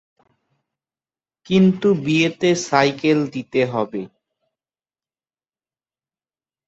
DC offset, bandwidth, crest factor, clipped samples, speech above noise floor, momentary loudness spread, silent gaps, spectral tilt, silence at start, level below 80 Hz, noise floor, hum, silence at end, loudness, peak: under 0.1%; 8 kHz; 20 dB; under 0.1%; over 72 dB; 9 LU; none; -5.5 dB/octave; 1.5 s; -62 dBFS; under -90 dBFS; none; 2.6 s; -18 LUFS; -2 dBFS